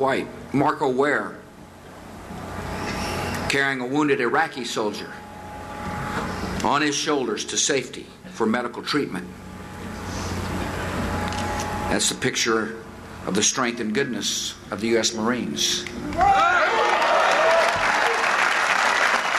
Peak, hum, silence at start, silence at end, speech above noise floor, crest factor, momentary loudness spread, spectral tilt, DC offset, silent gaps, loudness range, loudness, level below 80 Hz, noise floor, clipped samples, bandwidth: -6 dBFS; none; 0 s; 0 s; 20 dB; 18 dB; 18 LU; -3 dB/octave; under 0.1%; none; 7 LU; -22 LUFS; -46 dBFS; -43 dBFS; under 0.1%; 13.5 kHz